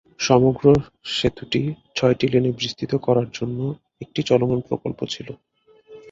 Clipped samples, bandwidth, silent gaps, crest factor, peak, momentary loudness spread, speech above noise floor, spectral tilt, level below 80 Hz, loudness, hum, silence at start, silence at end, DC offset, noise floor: under 0.1%; 7.8 kHz; none; 20 dB; -2 dBFS; 12 LU; 26 dB; -6 dB/octave; -50 dBFS; -21 LUFS; none; 0.2 s; 0 s; under 0.1%; -47 dBFS